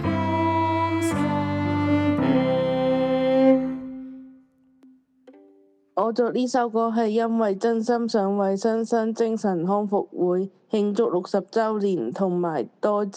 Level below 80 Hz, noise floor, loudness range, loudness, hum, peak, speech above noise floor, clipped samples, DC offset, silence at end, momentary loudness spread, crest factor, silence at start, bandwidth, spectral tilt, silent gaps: -58 dBFS; -57 dBFS; 4 LU; -23 LUFS; none; -6 dBFS; 34 dB; under 0.1%; under 0.1%; 0 s; 5 LU; 16 dB; 0 s; 13 kHz; -7 dB/octave; none